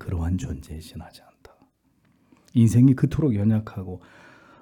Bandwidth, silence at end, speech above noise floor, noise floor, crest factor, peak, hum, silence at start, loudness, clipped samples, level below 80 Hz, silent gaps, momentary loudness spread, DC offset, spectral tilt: 14 kHz; 0.65 s; 42 dB; -64 dBFS; 18 dB; -6 dBFS; none; 0 s; -22 LUFS; under 0.1%; -46 dBFS; none; 22 LU; under 0.1%; -8.5 dB/octave